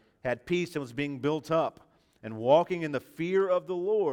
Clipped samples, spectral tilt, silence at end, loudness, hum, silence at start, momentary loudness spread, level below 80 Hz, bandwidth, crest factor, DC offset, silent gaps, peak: under 0.1%; -6.5 dB/octave; 0 s; -29 LUFS; none; 0.25 s; 10 LU; -66 dBFS; 16.5 kHz; 20 dB; under 0.1%; none; -10 dBFS